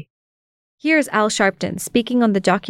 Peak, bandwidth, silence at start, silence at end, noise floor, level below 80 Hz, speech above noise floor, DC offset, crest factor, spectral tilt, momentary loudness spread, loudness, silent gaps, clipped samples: -2 dBFS; 16 kHz; 0.85 s; 0 s; under -90 dBFS; -56 dBFS; over 72 dB; under 0.1%; 18 dB; -4.5 dB/octave; 6 LU; -18 LUFS; none; under 0.1%